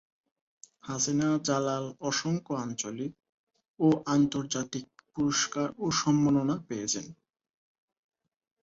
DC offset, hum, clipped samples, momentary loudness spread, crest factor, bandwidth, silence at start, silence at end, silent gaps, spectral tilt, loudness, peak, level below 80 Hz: under 0.1%; none; under 0.1%; 13 LU; 18 dB; 8 kHz; 0.85 s; 1.5 s; 3.29-3.47 s, 3.68-3.74 s; -4.5 dB/octave; -29 LUFS; -12 dBFS; -66 dBFS